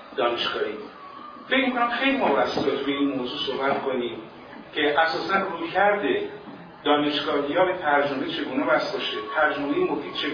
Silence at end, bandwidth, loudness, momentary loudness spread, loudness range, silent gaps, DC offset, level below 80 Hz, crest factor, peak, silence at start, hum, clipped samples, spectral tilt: 0 s; 5.4 kHz; -24 LUFS; 14 LU; 2 LU; none; under 0.1%; -62 dBFS; 18 dB; -8 dBFS; 0 s; none; under 0.1%; -5.5 dB/octave